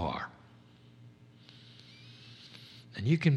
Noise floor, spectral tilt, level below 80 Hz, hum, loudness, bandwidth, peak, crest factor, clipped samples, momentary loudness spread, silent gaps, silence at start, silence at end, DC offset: -58 dBFS; -7.5 dB/octave; -62 dBFS; none; -35 LUFS; 8.6 kHz; -14 dBFS; 22 dB; under 0.1%; 24 LU; none; 0 s; 0 s; under 0.1%